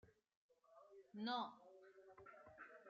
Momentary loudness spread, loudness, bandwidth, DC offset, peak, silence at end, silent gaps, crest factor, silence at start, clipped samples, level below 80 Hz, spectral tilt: 20 LU; -50 LUFS; 7.2 kHz; under 0.1%; -34 dBFS; 0 s; 0.36-0.49 s; 20 dB; 0.05 s; under 0.1%; under -90 dBFS; -2 dB/octave